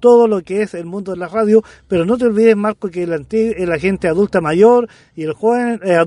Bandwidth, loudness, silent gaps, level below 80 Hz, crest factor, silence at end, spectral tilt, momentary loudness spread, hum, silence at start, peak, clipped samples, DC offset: 10.5 kHz; -15 LUFS; none; -48 dBFS; 14 dB; 0 s; -7 dB/octave; 12 LU; none; 0 s; 0 dBFS; under 0.1%; under 0.1%